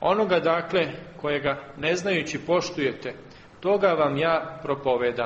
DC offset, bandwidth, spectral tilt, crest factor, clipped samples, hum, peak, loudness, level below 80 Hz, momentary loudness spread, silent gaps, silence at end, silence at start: under 0.1%; 8.4 kHz; -5 dB/octave; 18 dB; under 0.1%; none; -8 dBFS; -25 LUFS; -58 dBFS; 9 LU; none; 0 s; 0 s